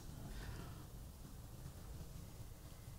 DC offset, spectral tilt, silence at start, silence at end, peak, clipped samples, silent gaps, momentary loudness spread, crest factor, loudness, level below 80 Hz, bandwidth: under 0.1%; -5 dB/octave; 0 s; 0 s; -38 dBFS; under 0.1%; none; 5 LU; 14 dB; -54 LUFS; -56 dBFS; 16 kHz